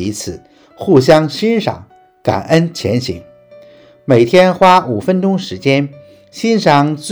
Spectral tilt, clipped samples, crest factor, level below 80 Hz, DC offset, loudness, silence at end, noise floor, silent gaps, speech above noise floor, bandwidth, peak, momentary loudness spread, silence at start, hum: -6 dB/octave; 0.8%; 14 dB; -48 dBFS; under 0.1%; -12 LUFS; 0 s; -41 dBFS; none; 29 dB; over 20 kHz; 0 dBFS; 16 LU; 0 s; none